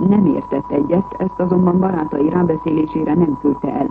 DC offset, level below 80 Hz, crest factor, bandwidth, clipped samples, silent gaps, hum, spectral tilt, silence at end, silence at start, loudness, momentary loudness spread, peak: under 0.1%; -44 dBFS; 12 dB; 3.8 kHz; under 0.1%; none; none; -11.5 dB/octave; 0 s; 0 s; -17 LUFS; 6 LU; -2 dBFS